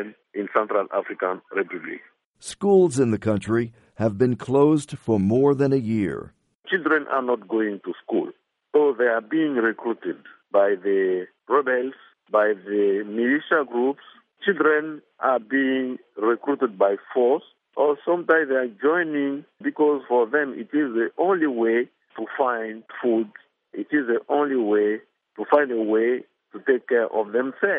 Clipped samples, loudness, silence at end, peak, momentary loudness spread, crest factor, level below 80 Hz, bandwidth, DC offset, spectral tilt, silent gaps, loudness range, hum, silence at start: under 0.1%; -23 LUFS; 0 s; -4 dBFS; 12 LU; 20 dB; -66 dBFS; 11.5 kHz; under 0.1%; -6.5 dB/octave; 2.25-2.34 s, 6.55-6.60 s; 3 LU; none; 0 s